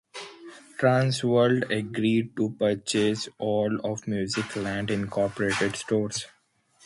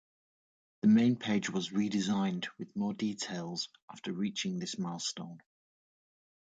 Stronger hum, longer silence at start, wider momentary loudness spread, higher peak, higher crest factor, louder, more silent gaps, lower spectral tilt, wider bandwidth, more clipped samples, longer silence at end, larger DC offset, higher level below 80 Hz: neither; second, 0.15 s vs 0.85 s; about the same, 11 LU vs 13 LU; first, -8 dBFS vs -18 dBFS; about the same, 20 dB vs 16 dB; first, -26 LUFS vs -33 LUFS; second, none vs 3.82-3.88 s; about the same, -5 dB/octave vs -5 dB/octave; first, 11.5 kHz vs 9.2 kHz; neither; second, 0.6 s vs 1.05 s; neither; first, -60 dBFS vs -76 dBFS